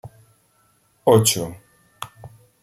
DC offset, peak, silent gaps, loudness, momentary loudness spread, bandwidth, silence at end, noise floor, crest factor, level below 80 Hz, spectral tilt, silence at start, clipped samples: under 0.1%; -2 dBFS; none; -18 LUFS; 22 LU; 16 kHz; 0.35 s; -62 dBFS; 22 dB; -58 dBFS; -4.5 dB/octave; 0.05 s; under 0.1%